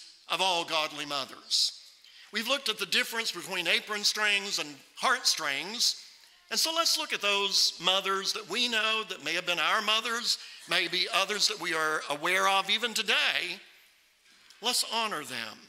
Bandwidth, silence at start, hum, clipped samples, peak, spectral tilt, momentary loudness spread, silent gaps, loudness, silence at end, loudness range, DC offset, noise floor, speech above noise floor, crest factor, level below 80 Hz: 16 kHz; 0 s; none; under 0.1%; -8 dBFS; 0 dB/octave; 8 LU; none; -27 LUFS; 0.05 s; 2 LU; under 0.1%; -62 dBFS; 33 dB; 22 dB; -84 dBFS